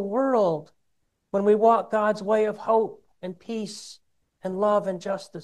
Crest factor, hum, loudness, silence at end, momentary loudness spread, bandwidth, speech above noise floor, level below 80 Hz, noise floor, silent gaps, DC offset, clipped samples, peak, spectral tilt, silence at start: 18 dB; none; -24 LUFS; 0 s; 18 LU; 12 kHz; 50 dB; -74 dBFS; -74 dBFS; none; under 0.1%; under 0.1%; -8 dBFS; -6 dB/octave; 0 s